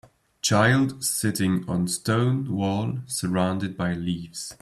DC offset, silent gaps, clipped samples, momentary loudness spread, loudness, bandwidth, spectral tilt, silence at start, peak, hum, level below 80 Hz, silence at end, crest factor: under 0.1%; none; under 0.1%; 8 LU; -24 LUFS; 15 kHz; -5 dB/octave; 0.45 s; -6 dBFS; none; -58 dBFS; 0.05 s; 18 dB